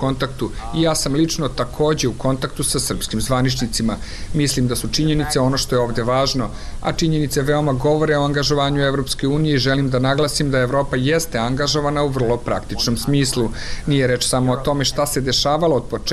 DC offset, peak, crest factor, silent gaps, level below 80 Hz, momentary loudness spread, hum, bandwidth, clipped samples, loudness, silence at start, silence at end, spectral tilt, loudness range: under 0.1%; -8 dBFS; 12 dB; none; -32 dBFS; 5 LU; none; 13.5 kHz; under 0.1%; -19 LUFS; 0 s; 0 s; -4.5 dB/octave; 2 LU